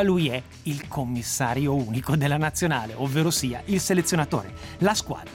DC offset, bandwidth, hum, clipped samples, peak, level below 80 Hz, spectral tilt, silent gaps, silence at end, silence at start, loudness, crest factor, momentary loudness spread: under 0.1%; 17 kHz; none; under 0.1%; -10 dBFS; -50 dBFS; -4.5 dB/octave; none; 0 s; 0 s; -25 LUFS; 14 dB; 8 LU